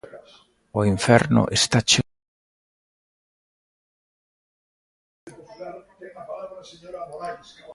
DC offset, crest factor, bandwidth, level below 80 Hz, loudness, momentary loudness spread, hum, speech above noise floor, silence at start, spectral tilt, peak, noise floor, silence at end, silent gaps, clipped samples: under 0.1%; 24 dB; 11.5 kHz; -52 dBFS; -19 LUFS; 23 LU; none; 35 dB; 0.15 s; -4 dB/octave; -2 dBFS; -55 dBFS; 0 s; 2.28-5.27 s; under 0.1%